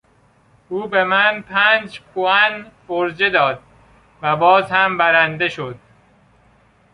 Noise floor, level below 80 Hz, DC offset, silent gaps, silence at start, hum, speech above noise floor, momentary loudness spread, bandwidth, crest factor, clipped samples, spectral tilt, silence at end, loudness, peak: -55 dBFS; -58 dBFS; under 0.1%; none; 0.7 s; none; 38 dB; 15 LU; 10.5 kHz; 18 dB; under 0.1%; -5.5 dB/octave; 1.2 s; -16 LUFS; -2 dBFS